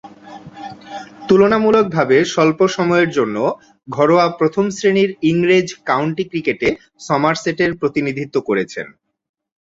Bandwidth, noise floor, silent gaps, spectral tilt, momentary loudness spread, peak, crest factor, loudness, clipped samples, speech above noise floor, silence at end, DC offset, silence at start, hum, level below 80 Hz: 7.8 kHz; -37 dBFS; none; -5.5 dB/octave; 18 LU; 0 dBFS; 16 dB; -16 LUFS; under 0.1%; 22 dB; 0.75 s; under 0.1%; 0.05 s; none; -54 dBFS